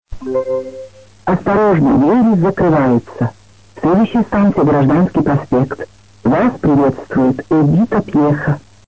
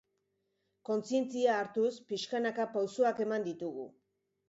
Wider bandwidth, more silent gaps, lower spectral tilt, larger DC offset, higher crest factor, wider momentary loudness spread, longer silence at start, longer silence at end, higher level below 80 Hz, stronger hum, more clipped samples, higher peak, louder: about the same, 8 kHz vs 8 kHz; neither; first, -9.5 dB/octave vs -4.5 dB/octave; first, 0.4% vs under 0.1%; second, 10 dB vs 18 dB; about the same, 10 LU vs 11 LU; second, 0.1 s vs 0.9 s; second, 0.3 s vs 0.6 s; first, -38 dBFS vs -82 dBFS; neither; neither; first, -4 dBFS vs -16 dBFS; first, -14 LUFS vs -34 LUFS